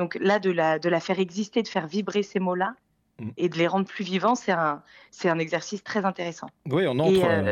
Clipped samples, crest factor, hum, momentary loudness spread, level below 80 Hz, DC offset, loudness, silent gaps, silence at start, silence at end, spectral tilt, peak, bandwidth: under 0.1%; 18 dB; none; 8 LU; -66 dBFS; under 0.1%; -25 LUFS; none; 0 s; 0 s; -6 dB/octave; -8 dBFS; 13 kHz